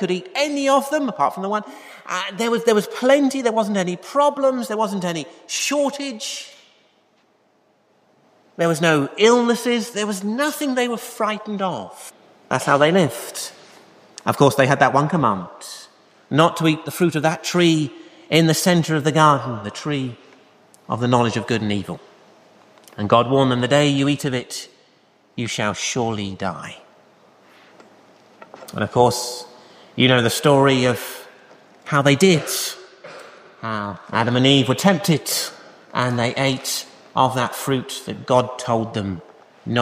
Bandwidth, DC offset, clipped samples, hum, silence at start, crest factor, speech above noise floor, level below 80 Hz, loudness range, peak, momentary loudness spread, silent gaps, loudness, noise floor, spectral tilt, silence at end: 15.5 kHz; under 0.1%; under 0.1%; none; 0 s; 20 dB; 41 dB; -62 dBFS; 7 LU; -2 dBFS; 16 LU; none; -19 LUFS; -61 dBFS; -4.5 dB/octave; 0 s